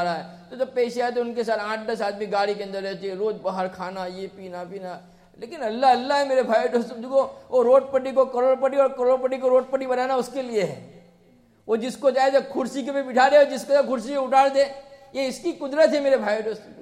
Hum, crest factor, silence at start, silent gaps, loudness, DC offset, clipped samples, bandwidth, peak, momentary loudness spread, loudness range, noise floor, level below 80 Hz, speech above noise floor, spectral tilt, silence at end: none; 18 dB; 0 s; none; -23 LUFS; under 0.1%; under 0.1%; 12.5 kHz; -4 dBFS; 14 LU; 7 LU; -57 dBFS; -66 dBFS; 34 dB; -4.5 dB/octave; 0 s